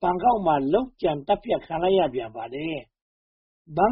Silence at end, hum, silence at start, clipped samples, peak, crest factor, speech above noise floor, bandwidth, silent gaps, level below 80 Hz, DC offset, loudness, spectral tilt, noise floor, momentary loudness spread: 0 s; none; 0 s; under 0.1%; -8 dBFS; 16 dB; over 66 dB; 5.4 kHz; 3.02-3.65 s; -50 dBFS; under 0.1%; -25 LUFS; -5 dB/octave; under -90 dBFS; 11 LU